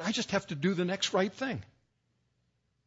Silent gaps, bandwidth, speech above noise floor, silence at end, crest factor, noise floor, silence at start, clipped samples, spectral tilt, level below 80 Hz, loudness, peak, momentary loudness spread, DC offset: none; 8 kHz; 45 dB; 1.2 s; 20 dB; -76 dBFS; 0 s; under 0.1%; -4.5 dB/octave; -68 dBFS; -31 LUFS; -14 dBFS; 7 LU; under 0.1%